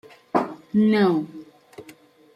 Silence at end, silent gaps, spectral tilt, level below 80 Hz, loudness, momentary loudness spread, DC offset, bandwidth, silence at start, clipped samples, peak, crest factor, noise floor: 0.55 s; none; -8 dB/octave; -68 dBFS; -22 LUFS; 16 LU; under 0.1%; 8.8 kHz; 0.35 s; under 0.1%; -6 dBFS; 18 dB; -50 dBFS